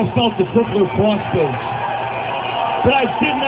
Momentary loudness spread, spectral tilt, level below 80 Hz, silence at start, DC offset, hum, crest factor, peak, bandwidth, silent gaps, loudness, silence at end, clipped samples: 6 LU; -10 dB/octave; -42 dBFS; 0 s; under 0.1%; none; 16 dB; 0 dBFS; 4 kHz; none; -18 LUFS; 0 s; under 0.1%